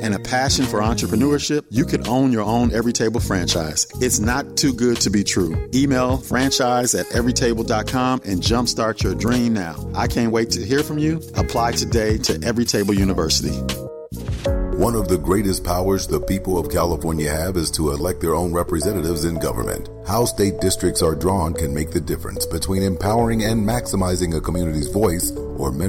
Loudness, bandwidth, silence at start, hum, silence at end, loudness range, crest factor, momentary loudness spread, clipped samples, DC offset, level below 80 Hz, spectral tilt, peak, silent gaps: -20 LUFS; 16.5 kHz; 0 s; none; 0 s; 2 LU; 14 dB; 5 LU; under 0.1%; under 0.1%; -32 dBFS; -4.5 dB/octave; -6 dBFS; none